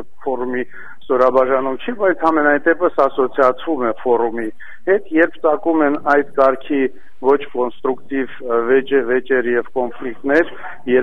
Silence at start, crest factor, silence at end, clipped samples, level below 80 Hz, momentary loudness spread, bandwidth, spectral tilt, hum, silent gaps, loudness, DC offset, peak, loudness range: 0 s; 16 dB; 0 s; under 0.1%; -54 dBFS; 9 LU; 6.2 kHz; -7 dB/octave; none; none; -17 LUFS; 4%; -2 dBFS; 2 LU